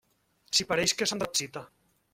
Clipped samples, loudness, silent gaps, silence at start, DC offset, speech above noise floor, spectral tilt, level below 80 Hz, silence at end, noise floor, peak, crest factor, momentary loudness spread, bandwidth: under 0.1%; -27 LUFS; none; 0.5 s; under 0.1%; 38 dB; -1.5 dB/octave; -64 dBFS; 0.45 s; -68 dBFS; -12 dBFS; 20 dB; 12 LU; 16.5 kHz